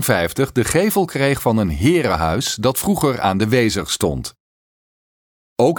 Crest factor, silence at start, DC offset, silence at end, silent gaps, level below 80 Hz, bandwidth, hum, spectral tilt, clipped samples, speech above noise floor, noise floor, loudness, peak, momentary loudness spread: 18 dB; 0 s; under 0.1%; 0 s; 4.40-5.56 s; -38 dBFS; 19.5 kHz; none; -5 dB/octave; under 0.1%; over 73 dB; under -90 dBFS; -18 LUFS; -2 dBFS; 4 LU